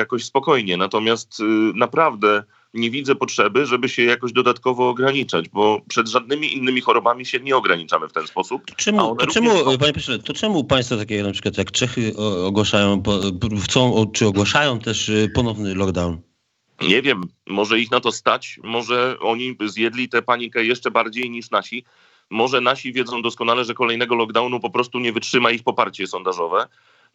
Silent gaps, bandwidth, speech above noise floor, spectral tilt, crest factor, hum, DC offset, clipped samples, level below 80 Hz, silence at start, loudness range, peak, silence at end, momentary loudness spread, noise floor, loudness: none; 8.4 kHz; 48 dB; -4 dB/octave; 20 dB; none; under 0.1%; under 0.1%; -52 dBFS; 0 s; 2 LU; 0 dBFS; 0.5 s; 7 LU; -67 dBFS; -19 LUFS